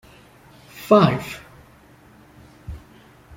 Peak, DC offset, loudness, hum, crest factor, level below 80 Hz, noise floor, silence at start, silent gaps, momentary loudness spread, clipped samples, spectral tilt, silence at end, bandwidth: -2 dBFS; under 0.1%; -17 LUFS; none; 22 dB; -50 dBFS; -50 dBFS; 0.8 s; none; 27 LU; under 0.1%; -7 dB/octave; 0.6 s; 16.5 kHz